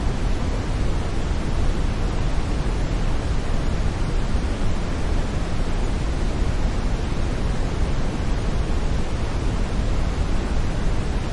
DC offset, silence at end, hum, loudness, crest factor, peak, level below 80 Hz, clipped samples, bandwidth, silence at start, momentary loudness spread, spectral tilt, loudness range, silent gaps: under 0.1%; 0 s; none; -26 LUFS; 12 dB; -8 dBFS; -22 dBFS; under 0.1%; 11 kHz; 0 s; 1 LU; -6 dB/octave; 0 LU; none